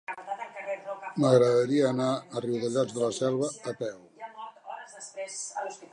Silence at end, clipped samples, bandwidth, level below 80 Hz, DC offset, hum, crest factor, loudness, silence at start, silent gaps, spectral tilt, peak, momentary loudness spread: 0.1 s; under 0.1%; 11 kHz; -78 dBFS; under 0.1%; none; 20 dB; -28 LUFS; 0.1 s; none; -5.5 dB/octave; -8 dBFS; 20 LU